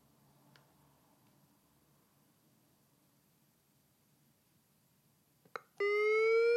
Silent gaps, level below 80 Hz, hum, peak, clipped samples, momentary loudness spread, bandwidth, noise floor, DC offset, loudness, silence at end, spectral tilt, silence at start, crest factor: none; under -90 dBFS; none; -24 dBFS; under 0.1%; 21 LU; 13 kHz; -73 dBFS; under 0.1%; -32 LUFS; 0 s; -3.5 dB/octave; 5.8 s; 16 dB